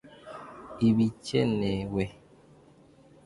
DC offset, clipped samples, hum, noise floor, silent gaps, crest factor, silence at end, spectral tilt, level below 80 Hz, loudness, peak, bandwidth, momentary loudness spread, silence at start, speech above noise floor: under 0.1%; under 0.1%; none; -57 dBFS; none; 18 dB; 1.15 s; -7 dB/octave; -54 dBFS; -28 LUFS; -12 dBFS; 11.5 kHz; 20 LU; 0.05 s; 30 dB